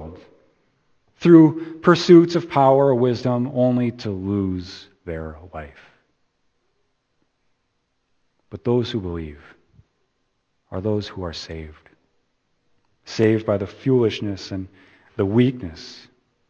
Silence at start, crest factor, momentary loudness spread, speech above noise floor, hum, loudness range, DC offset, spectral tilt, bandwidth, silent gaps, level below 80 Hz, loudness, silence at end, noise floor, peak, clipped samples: 0 s; 22 dB; 24 LU; 52 dB; none; 16 LU; under 0.1%; -7.5 dB/octave; 7.2 kHz; none; -50 dBFS; -19 LUFS; 0.55 s; -71 dBFS; 0 dBFS; under 0.1%